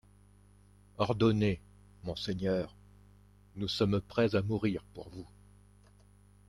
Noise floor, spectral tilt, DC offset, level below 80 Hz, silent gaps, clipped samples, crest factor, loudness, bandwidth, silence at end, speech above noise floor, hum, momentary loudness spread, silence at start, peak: -60 dBFS; -7 dB/octave; under 0.1%; -58 dBFS; none; under 0.1%; 22 dB; -32 LUFS; 11 kHz; 1.25 s; 29 dB; 50 Hz at -50 dBFS; 20 LU; 1 s; -14 dBFS